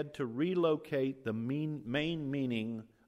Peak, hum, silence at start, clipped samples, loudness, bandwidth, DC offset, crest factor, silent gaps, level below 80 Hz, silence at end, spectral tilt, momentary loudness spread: -20 dBFS; none; 0 s; under 0.1%; -35 LUFS; 13.5 kHz; under 0.1%; 16 dB; none; -68 dBFS; 0.2 s; -7.5 dB/octave; 6 LU